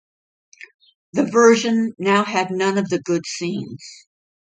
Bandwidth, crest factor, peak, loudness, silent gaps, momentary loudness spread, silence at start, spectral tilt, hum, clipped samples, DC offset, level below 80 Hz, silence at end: 9.4 kHz; 18 dB; -2 dBFS; -19 LUFS; 0.74-0.79 s, 0.95-1.13 s; 16 LU; 0.6 s; -4.5 dB/octave; none; under 0.1%; under 0.1%; -68 dBFS; 0.6 s